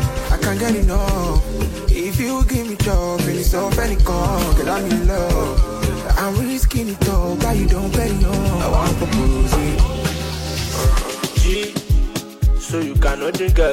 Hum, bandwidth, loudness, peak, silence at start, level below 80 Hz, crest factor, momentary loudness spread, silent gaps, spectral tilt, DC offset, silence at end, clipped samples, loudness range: none; 16.5 kHz; -19 LUFS; -2 dBFS; 0 s; -18 dBFS; 14 dB; 4 LU; none; -5.5 dB/octave; under 0.1%; 0 s; under 0.1%; 1 LU